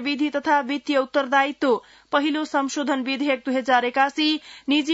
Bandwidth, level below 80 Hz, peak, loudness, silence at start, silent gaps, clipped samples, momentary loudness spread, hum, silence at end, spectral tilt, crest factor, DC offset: 8 kHz; -70 dBFS; -6 dBFS; -22 LUFS; 0 s; none; under 0.1%; 4 LU; none; 0 s; -2.5 dB/octave; 16 dB; under 0.1%